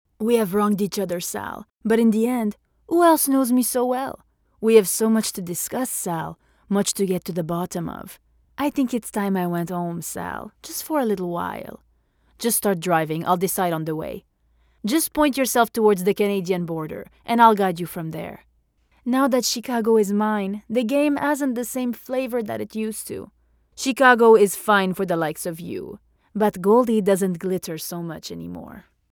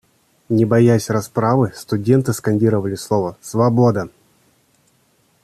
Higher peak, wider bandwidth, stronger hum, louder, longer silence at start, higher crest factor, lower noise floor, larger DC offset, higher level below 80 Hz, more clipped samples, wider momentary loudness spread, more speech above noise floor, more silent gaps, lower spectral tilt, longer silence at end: about the same, -2 dBFS vs -2 dBFS; first, over 20 kHz vs 14 kHz; neither; second, -21 LUFS vs -17 LUFS; second, 0.2 s vs 0.5 s; about the same, 20 dB vs 16 dB; first, -63 dBFS vs -59 dBFS; neither; about the same, -58 dBFS vs -54 dBFS; neither; first, 16 LU vs 8 LU; about the same, 42 dB vs 43 dB; neither; second, -4.5 dB/octave vs -7.5 dB/octave; second, 0.3 s vs 1.35 s